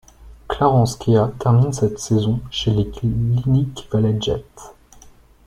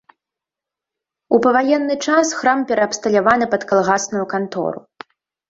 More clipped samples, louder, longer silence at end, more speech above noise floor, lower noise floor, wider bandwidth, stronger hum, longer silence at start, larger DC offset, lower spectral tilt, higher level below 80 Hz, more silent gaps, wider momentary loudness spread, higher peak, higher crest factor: neither; about the same, -19 LUFS vs -17 LUFS; about the same, 0.75 s vs 0.7 s; second, 29 dB vs 70 dB; second, -47 dBFS vs -86 dBFS; first, 12 kHz vs 8 kHz; neither; second, 0.2 s vs 1.3 s; neither; first, -7 dB/octave vs -4 dB/octave; first, -40 dBFS vs -60 dBFS; neither; about the same, 6 LU vs 8 LU; about the same, -2 dBFS vs 0 dBFS; about the same, 18 dB vs 18 dB